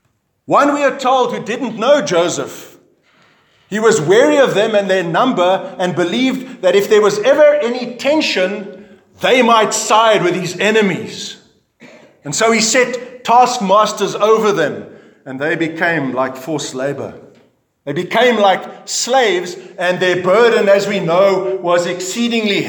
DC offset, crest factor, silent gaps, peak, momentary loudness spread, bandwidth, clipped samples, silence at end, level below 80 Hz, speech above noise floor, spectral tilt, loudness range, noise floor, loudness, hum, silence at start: under 0.1%; 14 dB; none; 0 dBFS; 11 LU; 19 kHz; under 0.1%; 0 s; -68 dBFS; 39 dB; -3.5 dB/octave; 4 LU; -53 dBFS; -14 LUFS; none; 0.5 s